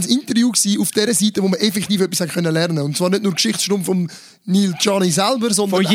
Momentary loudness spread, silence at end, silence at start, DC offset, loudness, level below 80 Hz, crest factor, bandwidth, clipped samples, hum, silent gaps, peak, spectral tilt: 4 LU; 0 s; 0 s; under 0.1%; -17 LUFS; -64 dBFS; 16 dB; 16.5 kHz; under 0.1%; none; none; -2 dBFS; -4 dB/octave